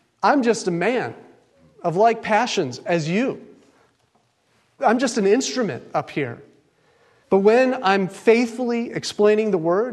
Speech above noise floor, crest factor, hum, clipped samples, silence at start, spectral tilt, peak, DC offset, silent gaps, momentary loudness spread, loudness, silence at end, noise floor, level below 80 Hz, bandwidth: 44 dB; 18 dB; none; under 0.1%; 0.2 s; -5 dB/octave; -2 dBFS; under 0.1%; none; 10 LU; -20 LUFS; 0 s; -64 dBFS; -70 dBFS; 12 kHz